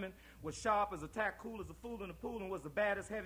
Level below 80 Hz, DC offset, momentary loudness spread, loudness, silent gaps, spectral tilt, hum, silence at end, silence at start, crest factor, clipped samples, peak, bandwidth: -60 dBFS; under 0.1%; 12 LU; -40 LUFS; none; -4.5 dB/octave; none; 0 s; 0 s; 20 dB; under 0.1%; -20 dBFS; over 20 kHz